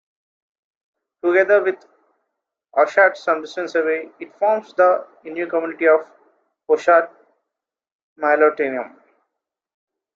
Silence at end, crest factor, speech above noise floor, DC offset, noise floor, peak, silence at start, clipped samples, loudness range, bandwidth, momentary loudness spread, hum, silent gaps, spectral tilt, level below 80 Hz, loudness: 1.3 s; 18 dB; 67 dB; under 0.1%; -85 dBFS; -2 dBFS; 1.25 s; under 0.1%; 2 LU; 7.4 kHz; 13 LU; none; 7.92-8.16 s; -4.5 dB/octave; -74 dBFS; -18 LUFS